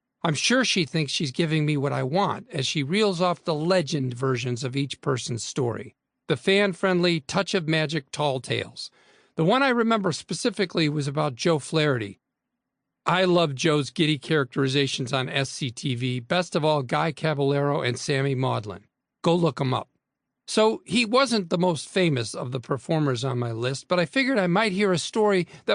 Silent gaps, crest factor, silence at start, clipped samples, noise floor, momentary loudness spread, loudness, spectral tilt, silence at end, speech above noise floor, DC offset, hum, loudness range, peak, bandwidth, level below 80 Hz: none; 18 dB; 0.25 s; under 0.1%; -83 dBFS; 7 LU; -24 LUFS; -5 dB/octave; 0 s; 59 dB; under 0.1%; none; 2 LU; -8 dBFS; 10.5 kHz; -66 dBFS